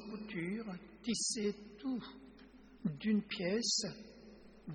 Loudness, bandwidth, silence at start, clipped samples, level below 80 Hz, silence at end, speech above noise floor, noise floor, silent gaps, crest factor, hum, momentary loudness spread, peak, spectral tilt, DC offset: -38 LUFS; 11 kHz; 0 s; under 0.1%; -68 dBFS; 0 s; 21 dB; -59 dBFS; none; 18 dB; none; 21 LU; -22 dBFS; -3.5 dB/octave; under 0.1%